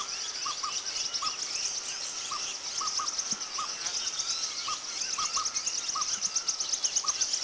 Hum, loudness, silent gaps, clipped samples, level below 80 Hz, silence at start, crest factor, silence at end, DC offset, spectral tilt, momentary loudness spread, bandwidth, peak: none; -30 LUFS; none; under 0.1%; -70 dBFS; 0 s; 18 dB; 0 s; under 0.1%; 2.5 dB/octave; 5 LU; 8 kHz; -14 dBFS